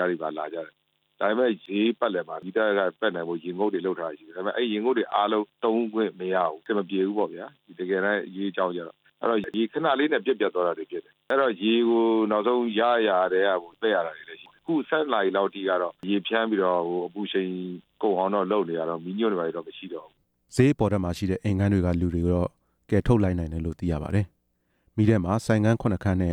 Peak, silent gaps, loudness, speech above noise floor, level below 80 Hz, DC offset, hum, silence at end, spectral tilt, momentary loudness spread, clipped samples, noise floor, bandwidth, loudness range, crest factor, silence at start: -6 dBFS; none; -26 LUFS; 47 dB; -48 dBFS; under 0.1%; none; 0 s; -7 dB/octave; 11 LU; under 0.1%; -72 dBFS; 11.5 kHz; 4 LU; 18 dB; 0 s